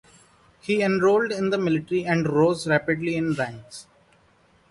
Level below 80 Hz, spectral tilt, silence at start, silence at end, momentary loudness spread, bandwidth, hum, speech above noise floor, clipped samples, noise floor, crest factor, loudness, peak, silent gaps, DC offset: -60 dBFS; -6.5 dB/octave; 0.65 s; 0.9 s; 15 LU; 11.5 kHz; none; 37 dB; under 0.1%; -60 dBFS; 16 dB; -23 LUFS; -8 dBFS; none; under 0.1%